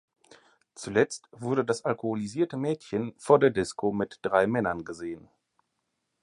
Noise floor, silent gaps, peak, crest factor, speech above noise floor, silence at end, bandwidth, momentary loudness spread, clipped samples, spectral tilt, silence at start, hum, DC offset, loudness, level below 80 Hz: -80 dBFS; none; -6 dBFS; 22 dB; 52 dB; 1.05 s; 11.5 kHz; 15 LU; under 0.1%; -6 dB/octave; 0.8 s; none; under 0.1%; -28 LUFS; -62 dBFS